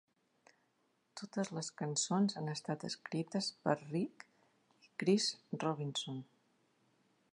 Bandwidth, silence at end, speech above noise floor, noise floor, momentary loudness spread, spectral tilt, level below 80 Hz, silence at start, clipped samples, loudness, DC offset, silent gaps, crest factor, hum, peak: 11 kHz; 1.1 s; 41 dB; -78 dBFS; 11 LU; -4.5 dB/octave; -88 dBFS; 1.15 s; under 0.1%; -38 LUFS; under 0.1%; none; 24 dB; none; -16 dBFS